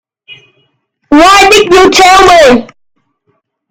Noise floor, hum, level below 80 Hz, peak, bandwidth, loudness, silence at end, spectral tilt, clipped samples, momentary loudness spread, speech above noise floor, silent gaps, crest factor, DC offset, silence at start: -59 dBFS; none; -32 dBFS; 0 dBFS; over 20 kHz; -3 LUFS; 1.05 s; -2.5 dB/octave; 8%; 5 LU; 56 dB; none; 6 dB; under 0.1%; 0.3 s